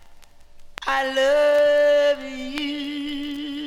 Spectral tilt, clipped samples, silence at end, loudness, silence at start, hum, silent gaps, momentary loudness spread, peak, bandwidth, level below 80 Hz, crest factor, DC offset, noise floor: -2.5 dB/octave; under 0.1%; 0 s; -21 LUFS; 0 s; none; none; 13 LU; -8 dBFS; 13.5 kHz; -50 dBFS; 14 dB; under 0.1%; -44 dBFS